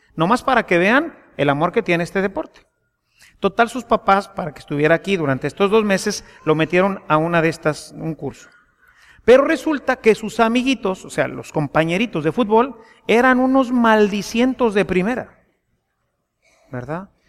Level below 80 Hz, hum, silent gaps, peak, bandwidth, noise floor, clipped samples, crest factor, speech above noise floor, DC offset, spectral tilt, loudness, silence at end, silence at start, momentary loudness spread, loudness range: -50 dBFS; none; none; -2 dBFS; 14.5 kHz; -71 dBFS; under 0.1%; 18 dB; 54 dB; under 0.1%; -5.5 dB/octave; -18 LUFS; 0.25 s; 0.15 s; 14 LU; 4 LU